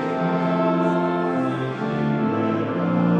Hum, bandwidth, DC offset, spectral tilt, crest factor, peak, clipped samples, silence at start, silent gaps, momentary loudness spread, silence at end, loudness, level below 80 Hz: none; 7.4 kHz; under 0.1%; -9 dB/octave; 12 dB; -8 dBFS; under 0.1%; 0 s; none; 4 LU; 0 s; -22 LUFS; -60 dBFS